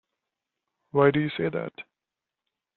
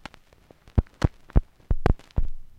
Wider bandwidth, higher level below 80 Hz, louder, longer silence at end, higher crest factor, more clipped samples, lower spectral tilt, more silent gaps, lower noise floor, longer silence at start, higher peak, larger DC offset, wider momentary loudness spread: second, 4.3 kHz vs 8.6 kHz; second, -66 dBFS vs -28 dBFS; first, -25 LUFS vs -28 LUFS; first, 0.95 s vs 0.15 s; about the same, 22 dB vs 22 dB; neither; second, -5.5 dB/octave vs -8 dB/octave; neither; first, -88 dBFS vs -55 dBFS; first, 0.95 s vs 0.75 s; about the same, -6 dBFS vs -4 dBFS; neither; first, 16 LU vs 8 LU